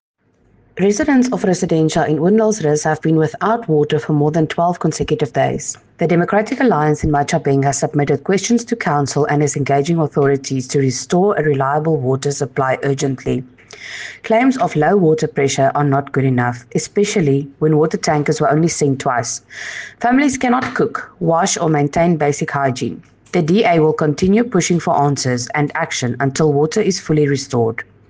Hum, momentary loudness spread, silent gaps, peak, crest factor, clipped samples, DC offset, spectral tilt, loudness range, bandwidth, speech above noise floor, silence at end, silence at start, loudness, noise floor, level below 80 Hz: none; 6 LU; none; -4 dBFS; 12 dB; under 0.1%; under 0.1%; -5.5 dB/octave; 2 LU; 10 kHz; 39 dB; 0.25 s; 0.75 s; -16 LUFS; -54 dBFS; -46 dBFS